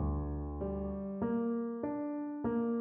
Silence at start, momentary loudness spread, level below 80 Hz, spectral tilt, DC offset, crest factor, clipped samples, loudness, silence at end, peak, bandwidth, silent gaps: 0 s; 5 LU; -44 dBFS; -11 dB/octave; under 0.1%; 12 dB; under 0.1%; -37 LUFS; 0 s; -22 dBFS; 3 kHz; none